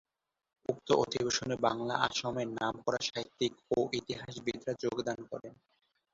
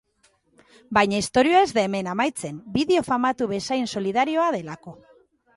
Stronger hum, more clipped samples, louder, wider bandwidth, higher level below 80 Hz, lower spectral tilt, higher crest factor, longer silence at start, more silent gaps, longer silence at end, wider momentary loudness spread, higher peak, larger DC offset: neither; neither; second, -34 LUFS vs -22 LUFS; second, 8 kHz vs 11.5 kHz; second, -68 dBFS vs -56 dBFS; about the same, -4 dB/octave vs -4.5 dB/octave; first, 26 dB vs 20 dB; second, 0.7 s vs 0.9 s; neither; about the same, 0.6 s vs 0.6 s; about the same, 10 LU vs 10 LU; second, -10 dBFS vs -4 dBFS; neither